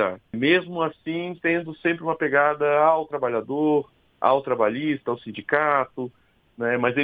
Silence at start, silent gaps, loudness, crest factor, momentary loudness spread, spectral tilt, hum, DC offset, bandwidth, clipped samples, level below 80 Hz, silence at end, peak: 0 s; none; -23 LUFS; 20 dB; 10 LU; -8.5 dB/octave; none; under 0.1%; 4.9 kHz; under 0.1%; -66 dBFS; 0 s; -4 dBFS